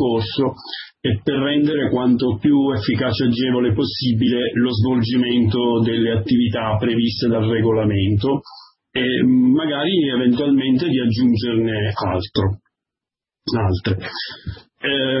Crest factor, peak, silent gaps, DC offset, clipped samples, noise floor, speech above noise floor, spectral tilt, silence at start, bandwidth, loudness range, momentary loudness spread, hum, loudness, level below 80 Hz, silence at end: 14 dB; -4 dBFS; none; under 0.1%; under 0.1%; -88 dBFS; 70 dB; -10.5 dB/octave; 0 s; 5.8 kHz; 3 LU; 8 LU; none; -18 LUFS; -46 dBFS; 0 s